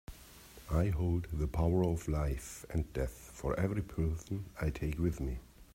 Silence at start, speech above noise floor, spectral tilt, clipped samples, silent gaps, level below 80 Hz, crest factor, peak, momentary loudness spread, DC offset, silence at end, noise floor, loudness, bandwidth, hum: 0.1 s; 21 dB; -7.5 dB/octave; under 0.1%; none; -42 dBFS; 16 dB; -18 dBFS; 10 LU; under 0.1%; 0.1 s; -55 dBFS; -36 LUFS; 16 kHz; none